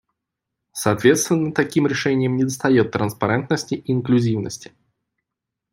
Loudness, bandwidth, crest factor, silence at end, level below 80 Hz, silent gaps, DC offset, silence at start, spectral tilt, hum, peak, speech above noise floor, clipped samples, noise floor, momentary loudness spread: -20 LUFS; 16 kHz; 18 dB; 1.1 s; -58 dBFS; none; under 0.1%; 0.75 s; -5.5 dB/octave; none; -2 dBFS; 64 dB; under 0.1%; -83 dBFS; 8 LU